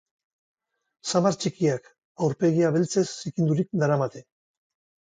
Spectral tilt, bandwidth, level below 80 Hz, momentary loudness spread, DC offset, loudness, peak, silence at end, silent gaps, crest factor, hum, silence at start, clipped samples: -6 dB/octave; 9.4 kHz; -68 dBFS; 7 LU; under 0.1%; -25 LUFS; -8 dBFS; 0.85 s; 2.05-2.15 s; 18 dB; none; 1.05 s; under 0.1%